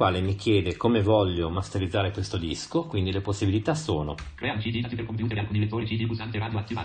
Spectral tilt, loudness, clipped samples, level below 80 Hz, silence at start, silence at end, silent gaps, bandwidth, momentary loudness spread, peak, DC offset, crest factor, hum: -6.5 dB/octave; -27 LUFS; under 0.1%; -42 dBFS; 0 s; 0 s; none; 9.4 kHz; 7 LU; -8 dBFS; under 0.1%; 18 dB; none